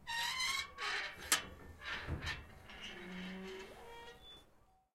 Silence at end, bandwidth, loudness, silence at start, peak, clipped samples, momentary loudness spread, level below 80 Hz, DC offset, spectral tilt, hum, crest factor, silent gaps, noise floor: 0.4 s; 16 kHz; -40 LUFS; 0 s; -16 dBFS; under 0.1%; 19 LU; -60 dBFS; under 0.1%; -1.5 dB/octave; none; 28 dB; none; -69 dBFS